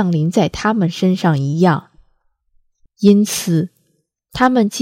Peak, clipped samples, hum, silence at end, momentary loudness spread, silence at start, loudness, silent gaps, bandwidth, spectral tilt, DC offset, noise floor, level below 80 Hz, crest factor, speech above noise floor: 0 dBFS; under 0.1%; none; 0 s; 7 LU; 0 s; -16 LUFS; none; 16 kHz; -6 dB/octave; under 0.1%; -65 dBFS; -46 dBFS; 16 dB; 51 dB